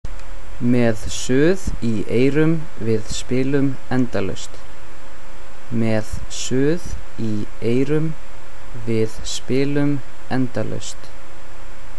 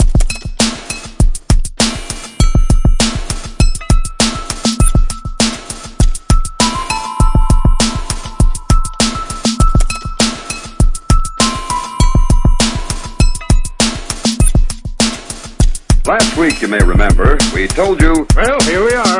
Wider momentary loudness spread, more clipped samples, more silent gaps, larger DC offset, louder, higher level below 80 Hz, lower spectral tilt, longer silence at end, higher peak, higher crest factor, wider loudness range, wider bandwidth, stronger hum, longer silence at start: first, 24 LU vs 9 LU; neither; neither; first, 20% vs under 0.1%; second, -22 LUFS vs -14 LUFS; second, -38 dBFS vs -14 dBFS; first, -6 dB/octave vs -4 dB/octave; about the same, 0 s vs 0 s; second, -4 dBFS vs 0 dBFS; about the same, 16 dB vs 12 dB; about the same, 5 LU vs 3 LU; about the same, 11 kHz vs 11.5 kHz; neither; about the same, 0 s vs 0 s